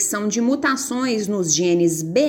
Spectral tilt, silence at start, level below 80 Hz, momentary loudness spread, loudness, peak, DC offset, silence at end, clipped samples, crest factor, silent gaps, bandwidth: -3.5 dB/octave; 0 s; -62 dBFS; 4 LU; -19 LUFS; -4 dBFS; under 0.1%; 0 s; under 0.1%; 14 dB; none; 17 kHz